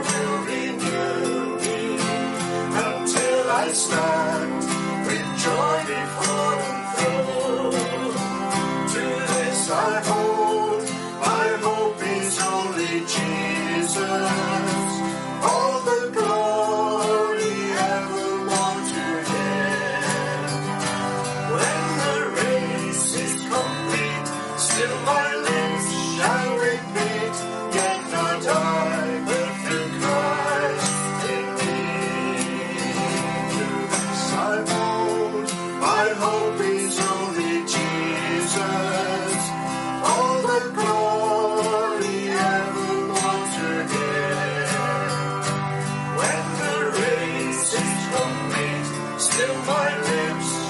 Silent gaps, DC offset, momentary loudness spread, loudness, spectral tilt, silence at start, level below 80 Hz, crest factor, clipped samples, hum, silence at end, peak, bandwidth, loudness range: none; under 0.1%; 4 LU; -23 LUFS; -3.5 dB/octave; 0 s; -60 dBFS; 18 dB; under 0.1%; none; 0 s; -6 dBFS; 11.5 kHz; 2 LU